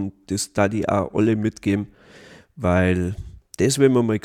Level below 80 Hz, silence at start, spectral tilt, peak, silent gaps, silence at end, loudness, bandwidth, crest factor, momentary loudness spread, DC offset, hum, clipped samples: -48 dBFS; 0 s; -6 dB/octave; -4 dBFS; none; 0.05 s; -21 LUFS; 16 kHz; 16 dB; 11 LU; under 0.1%; none; under 0.1%